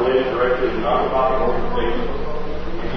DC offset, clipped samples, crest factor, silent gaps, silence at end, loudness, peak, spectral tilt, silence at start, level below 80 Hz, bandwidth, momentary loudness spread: under 0.1%; under 0.1%; 12 dB; none; 0 s; -21 LUFS; -6 dBFS; -7.5 dB/octave; 0 s; -32 dBFS; 6 kHz; 10 LU